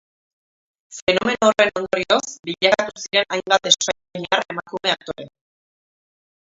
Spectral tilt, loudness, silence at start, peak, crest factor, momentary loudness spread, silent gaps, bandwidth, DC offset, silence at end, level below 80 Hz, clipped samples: -2 dB/octave; -19 LUFS; 0.9 s; 0 dBFS; 22 dB; 12 LU; 1.02-1.07 s; 7.8 kHz; under 0.1%; 1.2 s; -58 dBFS; under 0.1%